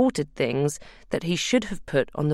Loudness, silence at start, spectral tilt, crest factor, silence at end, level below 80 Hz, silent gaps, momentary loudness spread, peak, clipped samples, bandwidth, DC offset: -26 LUFS; 0 s; -5 dB/octave; 16 dB; 0 s; -50 dBFS; none; 7 LU; -8 dBFS; under 0.1%; 13.5 kHz; under 0.1%